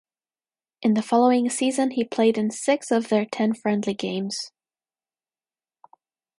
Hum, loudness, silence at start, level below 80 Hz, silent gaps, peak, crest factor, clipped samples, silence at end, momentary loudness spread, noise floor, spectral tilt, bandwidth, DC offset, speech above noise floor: none; -23 LUFS; 0.8 s; -74 dBFS; none; -6 dBFS; 18 dB; under 0.1%; 1.9 s; 8 LU; under -90 dBFS; -4.5 dB/octave; 11.5 kHz; under 0.1%; over 68 dB